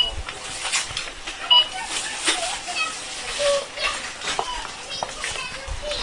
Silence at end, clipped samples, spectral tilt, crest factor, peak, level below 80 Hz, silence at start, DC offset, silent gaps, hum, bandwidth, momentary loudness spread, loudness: 0 s; under 0.1%; 0 dB/octave; 20 dB; -6 dBFS; -42 dBFS; 0 s; under 0.1%; none; none; 11 kHz; 15 LU; -23 LUFS